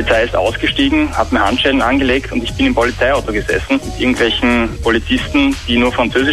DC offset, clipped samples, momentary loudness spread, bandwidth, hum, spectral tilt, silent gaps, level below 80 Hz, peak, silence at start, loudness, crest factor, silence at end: under 0.1%; under 0.1%; 4 LU; 13 kHz; none; -5 dB/octave; none; -28 dBFS; 0 dBFS; 0 s; -14 LUFS; 14 dB; 0 s